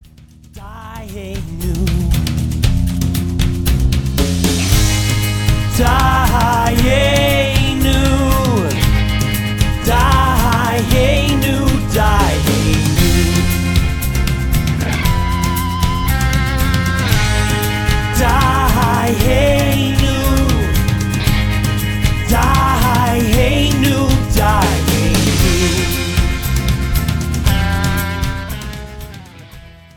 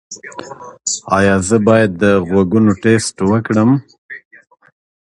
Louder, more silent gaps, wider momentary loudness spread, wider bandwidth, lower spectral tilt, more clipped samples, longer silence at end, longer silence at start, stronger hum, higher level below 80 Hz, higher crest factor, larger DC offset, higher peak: about the same, -15 LUFS vs -13 LUFS; second, none vs 3.98-4.09 s; second, 5 LU vs 21 LU; first, 19.5 kHz vs 11.5 kHz; about the same, -5 dB/octave vs -5.5 dB/octave; neither; second, 0.25 s vs 0.95 s; first, 0.55 s vs 0.1 s; neither; first, -20 dBFS vs -42 dBFS; about the same, 14 dB vs 14 dB; neither; about the same, 0 dBFS vs 0 dBFS